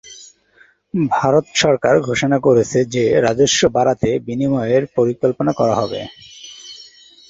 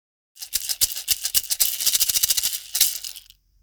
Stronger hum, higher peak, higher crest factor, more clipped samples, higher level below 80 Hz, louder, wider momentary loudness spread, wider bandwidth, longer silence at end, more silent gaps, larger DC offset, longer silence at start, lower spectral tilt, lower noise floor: neither; about the same, 0 dBFS vs 0 dBFS; second, 16 dB vs 24 dB; neither; first, -48 dBFS vs -54 dBFS; first, -16 LUFS vs -20 LUFS; first, 19 LU vs 10 LU; second, 8 kHz vs over 20 kHz; about the same, 0.45 s vs 0.4 s; neither; neither; second, 0.05 s vs 0.4 s; first, -4.5 dB/octave vs 3 dB/octave; first, -53 dBFS vs -47 dBFS